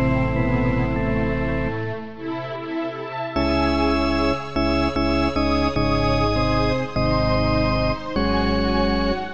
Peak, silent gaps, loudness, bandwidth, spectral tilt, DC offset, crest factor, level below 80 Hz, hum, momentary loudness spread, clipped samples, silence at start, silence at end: -8 dBFS; none; -22 LUFS; 8.4 kHz; -7 dB/octave; 2%; 14 dB; -30 dBFS; none; 8 LU; under 0.1%; 0 s; 0 s